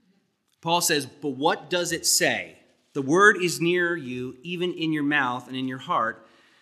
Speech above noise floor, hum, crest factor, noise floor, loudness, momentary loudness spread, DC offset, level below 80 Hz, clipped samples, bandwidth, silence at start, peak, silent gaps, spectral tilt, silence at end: 45 dB; none; 22 dB; -69 dBFS; -24 LUFS; 15 LU; under 0.1%; -74 dBFS; under 0.1%; 15 kHz; 0.65 s; -4 dBFS; none; -3 dB/octave; 0.45 s